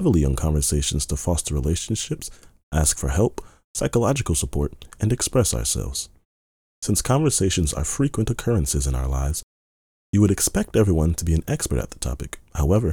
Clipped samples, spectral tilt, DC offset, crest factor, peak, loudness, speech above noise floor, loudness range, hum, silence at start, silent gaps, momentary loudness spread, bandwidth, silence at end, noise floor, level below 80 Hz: under 0.1%; -5 dB/octave; under 0.1%; 18 dB; -4 dBFS; -23 LUFS; over 68 dB; 2 LU; none; 0 s; 2.63-2.71 s, 3.64-3.74 s, 6.25-6.82 s, 9.43-10.13 s; 10 LU; 18.5 kHz; 0 s; under -90 dBFS; -32 dBFS